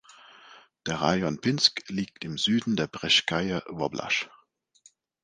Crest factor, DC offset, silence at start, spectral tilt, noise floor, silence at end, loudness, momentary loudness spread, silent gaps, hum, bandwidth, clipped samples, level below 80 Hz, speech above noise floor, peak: 22 dB; under 0.1%; 0.45 s; -4 dB/octave; -62 dBFS; 0.95 s; -26 LUFS; 11 LU; none; none; 10 kHz; under 0.1%; -60 dBFS; 35 dB; -6 dBFS